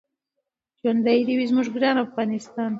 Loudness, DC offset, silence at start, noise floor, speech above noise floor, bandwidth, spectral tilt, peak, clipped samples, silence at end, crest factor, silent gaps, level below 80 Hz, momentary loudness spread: -23 LUFS; under 0.1%; 0.85 s; -81 dBFS; 60 dB; 7.8 kHz; -6 dB/octave; -6 dBFS; under 0.1%; 0 s; 16 dB; none; -72 dBFS; 7 LU